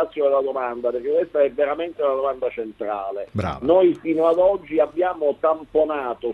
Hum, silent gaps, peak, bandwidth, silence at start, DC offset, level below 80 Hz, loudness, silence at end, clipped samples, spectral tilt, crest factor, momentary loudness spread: none; none; -6 dBFS; 6 kHz; 0 s; under 0.1%; -52 dBFS; -21 LUFS; 0 s; under 0.1%; -8 dB/octave; 16 dB; 10 LU